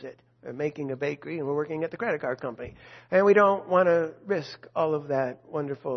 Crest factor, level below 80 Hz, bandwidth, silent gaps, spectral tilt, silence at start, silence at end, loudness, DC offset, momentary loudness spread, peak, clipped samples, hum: 20 dB; -66 dBFS; 6.4 kHz; none; -7.5 dB/octave; 0 s; 0 s; -27 LUFS; under 0.1%; 15 LU; -8 dBFS; under 0.1%; none